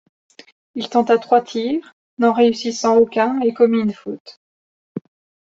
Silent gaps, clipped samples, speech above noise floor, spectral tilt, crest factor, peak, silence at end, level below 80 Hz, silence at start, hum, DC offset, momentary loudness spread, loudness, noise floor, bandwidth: 1.93-2.17 s, 4.20-4.25 s, 4.37-4.95 s; under 0.1%; over 73 dB; -5 dB/octave; 18 dB; -2 dBFS; 0.55 s; -64 dBFS; 0.75 s; none; under 0.1%; 19 LU; -17 LUFS; under -90 dBFS; 7.8 kHz